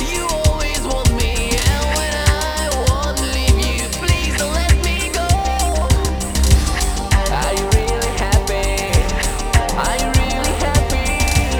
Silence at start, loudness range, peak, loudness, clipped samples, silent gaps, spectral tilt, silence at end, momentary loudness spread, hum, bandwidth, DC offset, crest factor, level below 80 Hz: 0 s; 1 LU; 0 dBFS; -17 LUFS; under 0.1%; none; -4 dB/octave; 0 s; 3 LU; none; over 20 kHz; under 0.1%; 16 dB; -20 dBFS